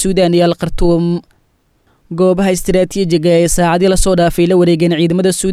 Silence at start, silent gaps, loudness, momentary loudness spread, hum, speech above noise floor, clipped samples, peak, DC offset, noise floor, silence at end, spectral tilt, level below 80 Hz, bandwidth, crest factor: 0 s; none; -12 LUFS; 4 LU; none; 45 dB; under 0.1%; -2 dBFS; under 0.1%; -57 dBFS; 0 s; -5.5 dB/octave; -26 dBFS; 15 kHz; 10 dB